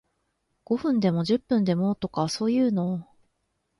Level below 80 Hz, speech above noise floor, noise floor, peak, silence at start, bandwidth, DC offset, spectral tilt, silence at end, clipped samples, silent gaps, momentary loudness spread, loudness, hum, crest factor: -62 dBFS; 51 dB; -75 dBFS; -10 dBFS; 0.7 s; 11.5 kHz; under 0.1%; -7 dB/octave; 0.75 s; under 0.1%; none; 6 LU; -25 LUFS; none; 16 dB